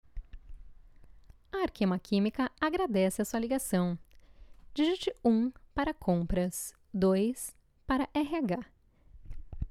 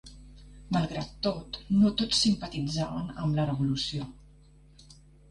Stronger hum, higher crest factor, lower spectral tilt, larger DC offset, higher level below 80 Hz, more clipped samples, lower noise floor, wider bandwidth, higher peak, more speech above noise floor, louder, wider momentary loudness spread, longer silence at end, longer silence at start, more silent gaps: neither; about the same, 16 dB vs 18 dB; about the same, -5.5 dB/octave vs -5.5 dB/octave; neither; about the same, -48 dBFS vs -50 dBFS; neither; about the same, -56 dBFS vs -56 dBFS; first, 15 kHz vs 11 kHz; second, -16 dBFS vs -12 dBFS; about the same, 26 dB vs 27 dB; about the same, -31 LUFS vs -29 LUFS; first, 14 LU vs 10 LU; second, 0 s vs 0.4 s; about the same, 0.15 s vs 0.05 s; neither